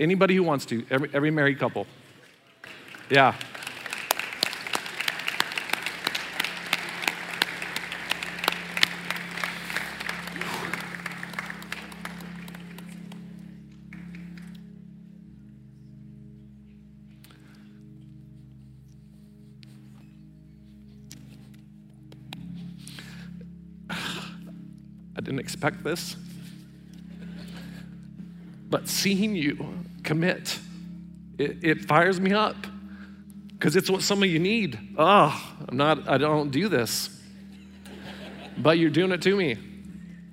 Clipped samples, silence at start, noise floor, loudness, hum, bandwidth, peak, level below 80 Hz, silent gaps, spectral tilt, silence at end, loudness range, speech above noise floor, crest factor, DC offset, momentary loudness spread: under 0.1%; 0 s; -55 dBFS; -26 LUFS; none; 16 kHz; 0 dBFS; -60 dBFS; none; -4.5 dB/octave; 0 s; 21 LU; 31 dB; 28 dB; under 0.1%; 24 LU